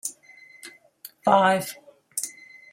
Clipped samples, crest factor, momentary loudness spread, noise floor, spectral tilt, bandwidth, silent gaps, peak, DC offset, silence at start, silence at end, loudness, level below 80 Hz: under 0.1%; 22 dB; 26 LU; -51 dBFS; -3.5 dB/octave; 16 kHz; none; -6 dBFS; under 0.1%; 0.05 s; 0.4 s; -24 LUFS; -76 dBFS